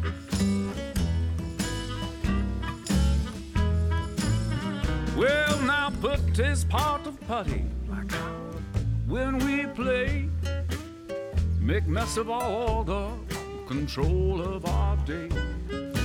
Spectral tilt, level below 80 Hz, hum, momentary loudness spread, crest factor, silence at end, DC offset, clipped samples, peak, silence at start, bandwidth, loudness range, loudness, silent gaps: -6 dB/octave; -32 dBFS; none; 8 LU; 16 dB; 0 s; under 0.1%; under 0.1%; -12 dBFS; 0 s; 17 kHz; 3 LU; -28 LUFS; none